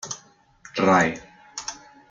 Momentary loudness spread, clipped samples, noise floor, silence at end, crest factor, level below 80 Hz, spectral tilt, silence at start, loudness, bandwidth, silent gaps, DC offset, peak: 20 LU; under 0.1%; -53 dBFS; 0.35 s; 20 dB; -60 dBFS; -4.5 dB/octave; 0.05 s; -23 LUFS; 9.4 kHz; none; under 0.1%; -6 dBFS